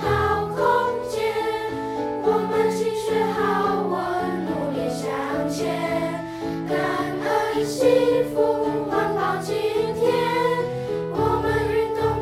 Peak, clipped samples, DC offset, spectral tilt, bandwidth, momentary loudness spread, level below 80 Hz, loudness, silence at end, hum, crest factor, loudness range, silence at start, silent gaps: -6 dBFS; under 0.1%; under 0.1%; -5.5 dB/octave; 15.5 kHz; 6 LU; -46 dBFS; -23 LUFS; 0 s; none; 16 dB; 3 LU; 0 s; none